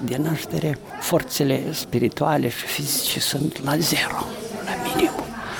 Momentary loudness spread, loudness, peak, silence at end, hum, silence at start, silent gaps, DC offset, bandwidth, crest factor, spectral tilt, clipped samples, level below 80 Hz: 7 LU; -23 LUFS; -6 dBFS; 0 s; none; 0 s; none; under 0.1%; 19.5 kHz; 18 dB; -4 dB/octave; under 0.1%; -50 dBFS